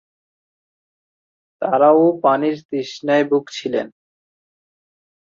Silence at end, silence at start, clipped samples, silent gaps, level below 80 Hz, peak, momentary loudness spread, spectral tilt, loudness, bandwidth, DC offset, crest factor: 1.45 s; 1.6 s; under 0.1%; 2.65-2.69 s; -72 dBFS; -2 dBFS; 13 LU; -6 dB/octave; -18 LUFS; 7.6 kHz; under 0.1%; 18 dB